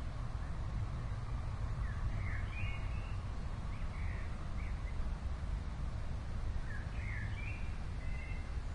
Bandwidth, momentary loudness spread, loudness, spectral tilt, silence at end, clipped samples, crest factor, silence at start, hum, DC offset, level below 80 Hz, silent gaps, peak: 10.5 kHz; 3 LU; -43 LUFS; -6.5 dB/octave; 0 s; under 0.1%; 12 dB; 0 s; none; under 0.1%; -40 dBFS; none; -26 dBFS